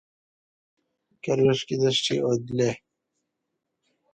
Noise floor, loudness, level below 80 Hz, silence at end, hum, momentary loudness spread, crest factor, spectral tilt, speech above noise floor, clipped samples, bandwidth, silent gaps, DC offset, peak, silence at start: -81 dBFS; -24 LUFS; -64 dBFS; 1.35 s; none; 8 LU; 18 dB; -5 dB/octave; 57 dB; under 0.1%; 9.2 kHz; none; under 0.1%; -10 dBFS; 1.25 s